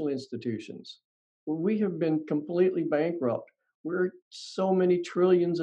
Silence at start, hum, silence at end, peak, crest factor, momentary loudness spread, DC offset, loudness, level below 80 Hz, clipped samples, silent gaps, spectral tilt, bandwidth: 0 s; none; 0 s; -12 dBFS; 16 dB; 18 LU; under 0.1%; -28 LUFS; -78 dBFS; under 0.1%; 1.04-1.47 s, 3.75-3.84 s, 4.22-4.31 s; -7.5 dB/octave; 8.6 kHz